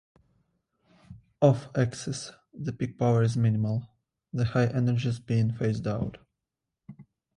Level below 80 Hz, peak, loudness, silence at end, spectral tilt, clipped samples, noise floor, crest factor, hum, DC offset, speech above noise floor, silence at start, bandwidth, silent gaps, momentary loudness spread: -56 dBFS; -8 dBFS; -28 LUFS; 0.35 s; -7.5 dB/octave; under 0.1%; -86 dBFS; 20 dB; none; under 0.1%; 60 dB; 1.1 s; 10.5 kHz; none; 13 LU